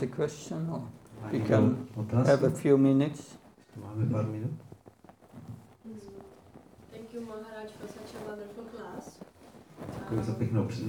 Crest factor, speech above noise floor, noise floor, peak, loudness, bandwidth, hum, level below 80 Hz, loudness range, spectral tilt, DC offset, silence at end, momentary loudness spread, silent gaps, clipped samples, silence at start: 20 dB; 26 dB; -56 dBFS; -10 dBFS; -29 LUFS; 17 kHz; none; -64 dBFS; 18 LU; -8 dB/octave; under 0.1%; 0 s; 24 LU; none; under 0.1%; 0 s